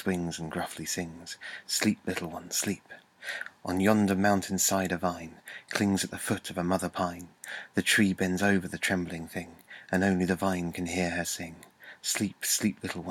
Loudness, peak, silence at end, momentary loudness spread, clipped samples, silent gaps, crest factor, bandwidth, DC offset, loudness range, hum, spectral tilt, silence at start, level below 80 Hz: -29 LUFS; -8 dBFS; 0 s; 15 LU; under 0.1%; none; 22 dB; 17.5 kHz; under 0.1%; 3 LU; none; -4 dB/octave; 0 s; -62 dBFS